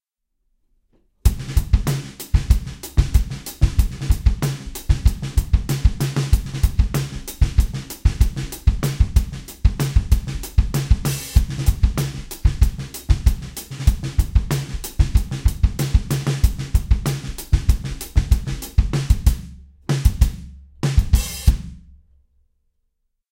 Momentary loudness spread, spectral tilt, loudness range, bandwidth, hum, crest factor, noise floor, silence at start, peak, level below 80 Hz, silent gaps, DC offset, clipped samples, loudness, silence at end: 6 LU; -5.5 dB/octave; 1 LU; 17 kHz; none; 18 dB; -72 dBFS; 1.25 s; 0 dBFS; -20 dBFS; none; under 0.1%; under 0.1%; -22 LUFS; 1.55 s